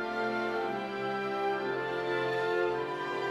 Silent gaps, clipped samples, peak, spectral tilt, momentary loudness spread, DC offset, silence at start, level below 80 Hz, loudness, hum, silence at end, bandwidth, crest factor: none; under 0.1%; -18 dBFS; -5.5 dB/octave; 4 LU; under 0.1%; 0 s; -70 dBFS; -32 LUFS; none; 0 s; 13 kHz; 14 dB